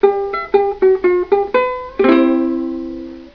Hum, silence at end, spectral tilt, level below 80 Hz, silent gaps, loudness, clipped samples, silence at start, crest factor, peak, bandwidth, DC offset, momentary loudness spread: none; 0.05 s; -7.5 dB/octave; -46 dBFS; none; -15 LUFS; under 0.1%; 0 s; 16 dB; 0 dBFS; 5.4 kHz; 0.2%; 11 LU